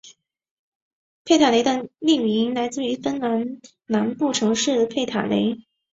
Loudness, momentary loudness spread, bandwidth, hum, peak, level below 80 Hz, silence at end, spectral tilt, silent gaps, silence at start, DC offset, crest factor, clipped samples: -21 LUFS; 8 LU; 8 kHz; none; -4 dBFS; -64 dBFS; 0.35 s; -4 dB/octave; 0.51-1.25 s; 0.05 s; under 0.1%; 20 dB; under 0.1%